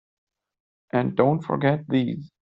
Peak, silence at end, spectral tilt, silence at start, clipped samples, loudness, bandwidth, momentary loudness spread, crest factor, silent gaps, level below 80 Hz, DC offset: -4 dBFS; 0.25 s; -7 dB/octave; 0.95 s; under 0.1%; -24 LUFS; 5.6 kHz; 6 LU; 20 dB; none; -64 dBFS; under 0.1%